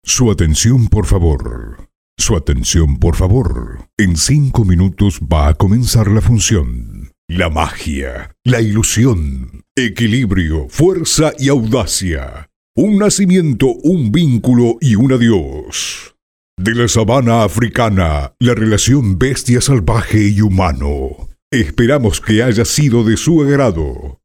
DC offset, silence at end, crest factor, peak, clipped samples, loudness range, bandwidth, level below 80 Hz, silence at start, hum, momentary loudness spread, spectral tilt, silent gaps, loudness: under 0.1%; 0.1 s; 12 dB; 0 dBFS; under 0.1%; 2 LU; 16.5 kHz; -22 dBFS; 0.05 s; none; 10 LU; -5.5 dB/octave; 1.95-2.17 s, 3.93-3.97 s, 7.18-7.28 s, 9.71-9.75 s, 12.56-12.74 s, 16.22-16.57 s, 21.42-21.51 s; -13 LUFS